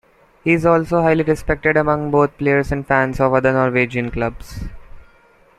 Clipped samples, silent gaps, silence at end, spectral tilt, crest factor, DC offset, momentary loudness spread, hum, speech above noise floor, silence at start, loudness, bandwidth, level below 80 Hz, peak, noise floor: under 0.1%; none; 0.6 s; -7.5 dB/octave; 16 dB; under 0.1%; 9 LU; none; 35 dB; 0.45 s; -17 LUFS; 13.5 kHz; -36 dBFS; -2 dBFS; -51 dBFS